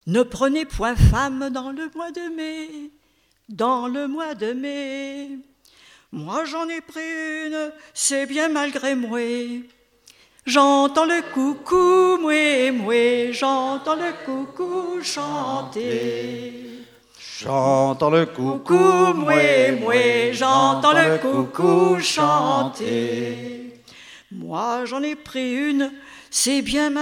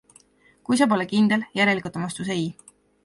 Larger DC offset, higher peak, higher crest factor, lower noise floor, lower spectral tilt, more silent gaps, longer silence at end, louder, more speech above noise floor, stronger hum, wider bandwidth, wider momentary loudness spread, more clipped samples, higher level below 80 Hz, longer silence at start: neither; first, 0 dBFS vs -4 dBFS; about the same, 20 dB vs 20 dB; first, -63 dBFS vs -57 dBFS; about the same, -4.5 dB/octave vs -5 dB/octave; neither; second, 0 s vs 0.55 s; first, -20 LUFS vs -23 LUFS; first, 43 dB vs 35 dB; neither; first, 16 kHz vs 11.5 kHz; first, 16 LU vs 10 LU; neither; first, -38 dBFS vs -62 dBFS; second, 0.05 s vs 0.7 s